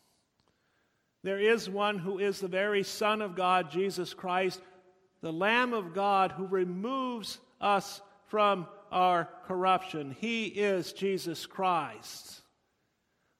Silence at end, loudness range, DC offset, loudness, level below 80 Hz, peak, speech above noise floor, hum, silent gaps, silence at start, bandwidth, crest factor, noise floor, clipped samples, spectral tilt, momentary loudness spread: 1 s; 2 LU; under 0.1%; -31 LUFS; -78 dBFS; -12 dBFS; 46 dB; none; none; 1.25 s; 16 kHz; 20 dB; -77 dBFS; under 0.1%; -4.5 dB/octave; 12 LU